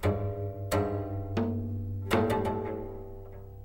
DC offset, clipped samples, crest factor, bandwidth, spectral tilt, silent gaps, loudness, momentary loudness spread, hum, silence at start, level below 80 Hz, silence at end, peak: 0.1%; under 0.1%; 20 dB; 16 kHz; -7 dB/octave; none; -32 LUFS; 15 LU; none; 0 s; -46 dBFS; 0 s; -12 dBFS